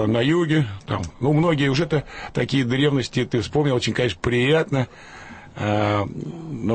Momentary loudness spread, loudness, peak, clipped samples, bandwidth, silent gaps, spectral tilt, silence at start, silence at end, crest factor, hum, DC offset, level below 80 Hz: 11 LU; -22 LUFS; -8 dBFS; under 0.1%; 8.8 kHz; none; -6.5 dB/octave; 0 s; 0 s; 14 dB; none; under 0.1%; -46 dBFS